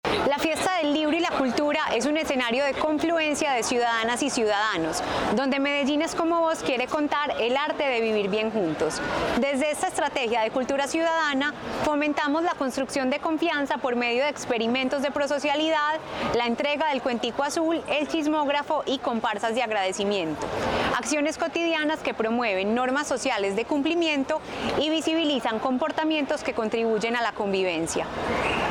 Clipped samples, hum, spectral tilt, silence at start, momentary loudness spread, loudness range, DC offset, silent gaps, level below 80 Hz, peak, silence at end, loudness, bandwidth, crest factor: under 0.1%; none; -3.5 dB/octave; 0.05 s; 3 LU; 2 LU; under 0.1%; none; -54 dBFS; -14 dBFS; 0 s; -25 LUFS; 19 kHz; 12 dB